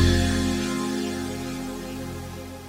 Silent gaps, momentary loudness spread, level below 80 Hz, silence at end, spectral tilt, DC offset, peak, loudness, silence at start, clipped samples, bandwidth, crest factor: none; 12 LU; -36 dBFS; 0 s; -5 dB/octave; under 0.1%; -6 dBFS; -27 LUFS; 0 s; under 0.1%; 16 kHz; 20 dB